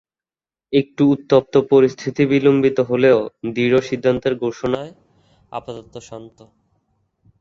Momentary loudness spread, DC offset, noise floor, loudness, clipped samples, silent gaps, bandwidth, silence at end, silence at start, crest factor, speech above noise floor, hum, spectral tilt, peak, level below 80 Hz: 20 LU; under 0.1%; under -90 dBFS; -17 LUFS; under 0.1%; none; 7.4 kHz; 1.15 s; 0.7 s; 18 dB; over 73 dB; none; -7 dB/octave; 0 dBFS; -56 dBFS